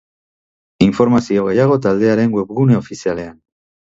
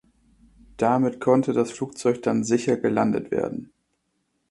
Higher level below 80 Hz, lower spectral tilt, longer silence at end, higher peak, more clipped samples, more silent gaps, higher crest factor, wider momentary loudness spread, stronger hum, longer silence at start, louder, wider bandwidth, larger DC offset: first, -48 dBFS vs -60 dBFS; about the same, -7.5 dB/octave vs -6.5 dB/octave; second, 0.55 s vs 0.85 s; first, 0 dBFS vs -6 dBFS; neither; neither; about the same, 16 dB vs 20 dB; about the same, 9 LU vs 7 LU; neither; about the same, 0.8 s vs 0.8 s; first, -15 LUFS vs -23 LUFS; second, 8 kHz vs 11.5 kHz; neither